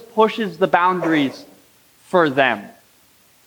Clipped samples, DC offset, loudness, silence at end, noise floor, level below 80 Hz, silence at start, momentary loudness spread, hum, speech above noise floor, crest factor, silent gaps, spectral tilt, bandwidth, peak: under 0.1%; under 0.1%; -18 LUFS; 0.8 s; -54 dBFS; -70 dBFS; 0.15 s; 8 LU; none; 37 dB; 18 dB; none; -6 dB/octave; over 20 kHz; -2 dBFS